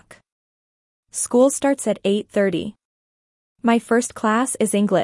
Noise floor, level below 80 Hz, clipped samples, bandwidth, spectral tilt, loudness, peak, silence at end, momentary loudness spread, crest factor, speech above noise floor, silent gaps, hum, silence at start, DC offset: under -90 dBFS; -64 dBFS; under 0.1%; 12 kHz; -4.5 dB/octave; -20 LUFS; -4 dBFS; 0 s; 9 LU; 16 dB; over 71 dB; 2.85-3.56 s; none; 1.15 s; under 0.1%